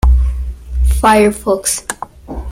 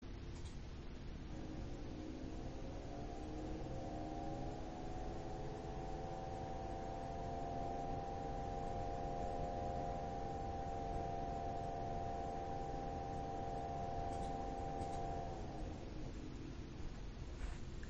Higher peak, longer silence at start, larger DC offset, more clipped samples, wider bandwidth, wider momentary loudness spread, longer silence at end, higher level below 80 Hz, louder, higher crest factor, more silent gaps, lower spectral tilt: first, 0 dBFS vs -30 dBFS; about the same, 0.05 s vs 0 s; neither; neither; first, 15.5 kHz vs 8.2 kHz; first, 17 LU vs 7 LU; about the same, 0 s vs 0 s; first, -16 dBFS vs -50 dBFS; first, -14 LUFS vs -47 LUFS; about the same, 14 dB vs 14 dB; neither; second, -5 dB/octave vs -7 dB/octave